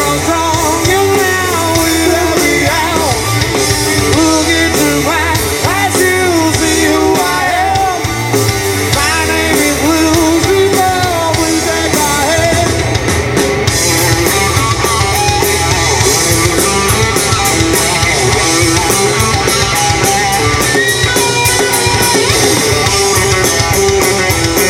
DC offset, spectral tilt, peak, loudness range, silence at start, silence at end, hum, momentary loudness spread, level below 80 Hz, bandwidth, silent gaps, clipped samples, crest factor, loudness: under 0.1%; -3 dB/octave; 0 dBFS; 2 LU; 0 s; 0 s; none; 3 LU; -28 dBFS; 17.5 kHz; none; under 0.1%; 10 dB; -10 LUFS